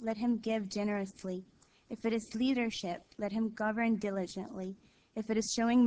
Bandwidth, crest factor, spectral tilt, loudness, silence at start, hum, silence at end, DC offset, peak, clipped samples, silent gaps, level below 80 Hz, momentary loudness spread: 8 kHz; 16 dB; -5 dB/octave; -35 LUFS; 0 s; none; 0 s; under 0.1%; -18 dBFS; under 0.1%; none; -68 dBFS; 12 LU